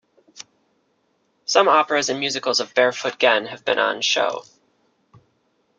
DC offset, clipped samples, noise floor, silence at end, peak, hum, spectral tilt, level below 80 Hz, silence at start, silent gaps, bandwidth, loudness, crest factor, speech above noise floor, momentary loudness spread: under 0.1%; under 0.1%; -67 dBFS; 1.35 s; -2 dBFS; none; -1.5 dB/octave; -72 dBFS; 0.35 s; none; 9.4 kHz; -19 LUFS; 22 dB; 47 dB; 7 LU